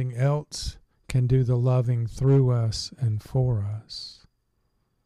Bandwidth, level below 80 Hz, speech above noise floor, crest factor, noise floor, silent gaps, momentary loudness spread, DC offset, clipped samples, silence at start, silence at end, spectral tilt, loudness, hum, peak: 11.5 kHz; -46 dBFS; 48 dB; 12 dB; -71 dBFS; none; 14 LU; under 0.1%; under 0.1%; 0 s; 0.9 s; -7 dB/octave; -25 LUFS; none; -12 dBFS